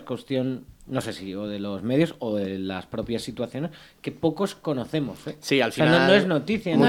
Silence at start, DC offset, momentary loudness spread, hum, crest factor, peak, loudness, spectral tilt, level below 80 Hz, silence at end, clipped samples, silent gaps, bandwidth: 0 s; under 0.1%; 14 LU; none; 20 dB; -4 dBFS; -25 LUFS; -6 dB/octave; -58 dBFS; 0 s; under 0.1%; none; 17 kHz